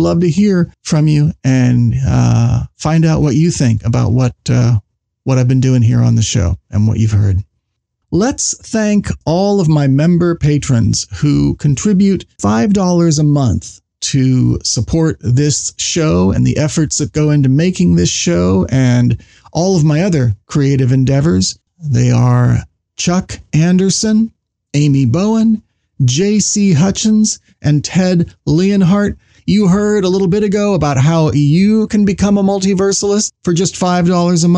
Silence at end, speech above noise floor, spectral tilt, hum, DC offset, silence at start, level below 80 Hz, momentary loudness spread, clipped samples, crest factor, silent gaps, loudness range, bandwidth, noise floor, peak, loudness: 0 s; 59 dB; -6 dB/octave; none; under 0.1%; 0 s; -34 dBFS; 5 LU; under 0.1%; 10 dB; none; 2 LU; 10 kHz; -70 dBFS; -2 dBFS; -13 LUFS